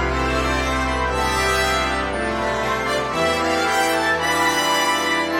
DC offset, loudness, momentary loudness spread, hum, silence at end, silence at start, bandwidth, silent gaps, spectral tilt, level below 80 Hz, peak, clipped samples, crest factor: under 0.1%; -19 LUFS; 4 LU; none; 0 s; 0 s; 16.5 kHz; none; -3.5 dB/octave; -32 dBFS; -6 dBFS; under 0.1%; 14 dB